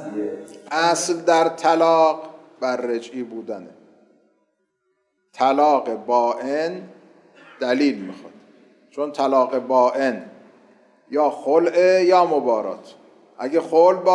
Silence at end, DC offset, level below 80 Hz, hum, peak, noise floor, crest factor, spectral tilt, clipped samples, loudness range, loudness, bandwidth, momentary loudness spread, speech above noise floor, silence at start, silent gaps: 0 s; under 0.1%; -86 dBFS; none; -4 dBFS; -71 dBFS; 16 dB; -4 dB/octave; under 0.1%; 6 LU; -19 LUFS; 11.5 kHz; 16 LU; 52 dB; 0 s; none